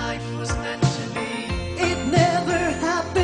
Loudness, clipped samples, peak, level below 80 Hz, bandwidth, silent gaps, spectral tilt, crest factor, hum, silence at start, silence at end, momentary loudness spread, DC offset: -23 LUFS; under 0.1%; -4 dBFS; -38 dBFS; 10 kHz; none; -5 dB/octave; 18 dB; none; 0 s; 0 s; 9 LU; under 0.1%